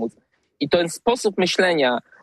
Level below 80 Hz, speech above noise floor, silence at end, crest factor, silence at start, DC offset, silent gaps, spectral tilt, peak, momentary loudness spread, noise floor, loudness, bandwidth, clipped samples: -56 dBFS; 41 dB; 0.25 s; 16 dB; 0 s; under 0.1%; none; -4 dB/octave; -6 dBFS; 7 LU; -62 dBFS; -20 LUFS; 12.5 kHz; under 0.1%